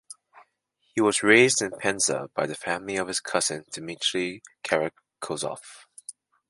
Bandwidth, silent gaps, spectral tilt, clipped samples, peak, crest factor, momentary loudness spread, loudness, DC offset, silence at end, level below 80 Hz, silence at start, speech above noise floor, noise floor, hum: 11.5 kHz; none; -2.5 dB/octave; under 0.1%; -4 dBFS; 24 dB; 23 LU; -25 LUFS; under 0.1%; 0.4 s; -68 dBFS; 0.1 s; 46 dB; -72 dBFS; none